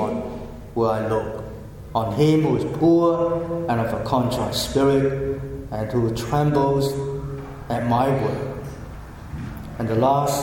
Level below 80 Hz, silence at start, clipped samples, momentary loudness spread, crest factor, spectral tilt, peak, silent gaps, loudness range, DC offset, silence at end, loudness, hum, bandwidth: -40 dBFS; 0 s; under 0.1%; 16 LU; 16 dB; -6.5 dB/octave; -6 dBFS; none; 4 LU; under 0.1%; 0 s; -22 LUFS; none; 17.5 kHz